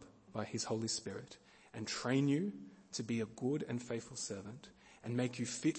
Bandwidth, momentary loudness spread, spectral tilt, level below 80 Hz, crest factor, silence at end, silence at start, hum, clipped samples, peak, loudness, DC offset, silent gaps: 8.8 kHz; 18 LU; -4.5 dB/octave; -76 dBFS; 18 dB; 0 s; 0 s; none; under 0.1%; -22 dBFS; -40 LUFS; under 0.1%; none